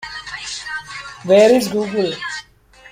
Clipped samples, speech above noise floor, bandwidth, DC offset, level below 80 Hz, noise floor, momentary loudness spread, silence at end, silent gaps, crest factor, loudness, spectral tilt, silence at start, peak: under 0.1%; 32 dB; 16 kHz; under 0.1%; -54 dBFS; -46 dBFS; 18 LU; 0.05 s; none; 16 dB; -17 LUFS; -4 dB/octave; 0 s; -2 dBFS